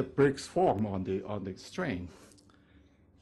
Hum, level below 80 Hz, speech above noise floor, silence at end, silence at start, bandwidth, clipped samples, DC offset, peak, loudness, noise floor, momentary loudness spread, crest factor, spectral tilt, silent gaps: none; -60 dBFS; 30 dB; 0.95 s; 0 s; 12 kHz; under 0.1%; under 0.1%; -14 dBFS; -32 LUFS; -61 dBFS; 12 LU; 18 dB; -6.5 dB/octave; none